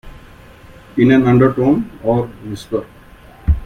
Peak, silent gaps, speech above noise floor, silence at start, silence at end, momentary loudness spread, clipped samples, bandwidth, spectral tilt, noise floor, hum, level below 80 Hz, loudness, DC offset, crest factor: 0 dBFS; none; 27 dB; 0.05 s; 0 s; 14 LU; under 0.1%; 10 kHz; -8.5 dB/octave; -41 dBFS; none; -28 dBFS; -15 LUFS; under 0.1%; 16 dB